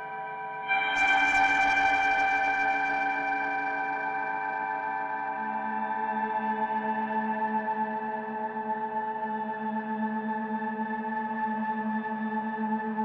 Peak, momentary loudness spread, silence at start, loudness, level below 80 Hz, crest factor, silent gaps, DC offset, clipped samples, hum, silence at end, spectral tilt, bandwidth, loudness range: -12 dBFS; 9 LU; 0 s; -28 LUFS; -64 dBFS; 16 dB; none; under 0.1%; under 0.1%; none; 0 s; -4.5 dB/octave; 9.8 kHz; 7 LU